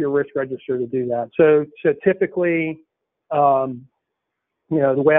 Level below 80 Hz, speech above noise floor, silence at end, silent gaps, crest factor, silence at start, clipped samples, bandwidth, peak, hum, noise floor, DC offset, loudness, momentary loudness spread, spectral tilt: -64 dBFS; 61 dB; 0 s; none; 16 dB; 0 s; under 0.1%; 3.8 kHz; -4 dBFS; none; -79 dBFS; under 0.1%; -20 LUFS; 10 LU; -3 dB/octave